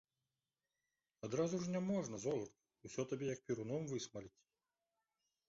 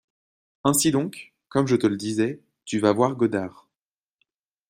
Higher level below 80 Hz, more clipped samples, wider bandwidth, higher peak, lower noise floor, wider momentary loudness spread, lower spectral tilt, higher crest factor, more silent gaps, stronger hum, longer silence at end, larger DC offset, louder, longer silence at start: second, -78 dBFS vs -62 dBFS; neither; second, 7.6 kHz vs 15.5 kHz; second, -26 dBFS vs -4 dBFS; about the same, under -90 dBFS vs under -90 dBFS; about the same, 14 LU vs 12 LU; first, -7 dB/octave vs -5 dB/octave; about the same, 18 dB vs 20 dB; neither; neither; about the same, 1.2 s vs 1.2 s; neither; second, -43 LUFS vs -23 LUFS; first, 1.25 s vs 0.65 s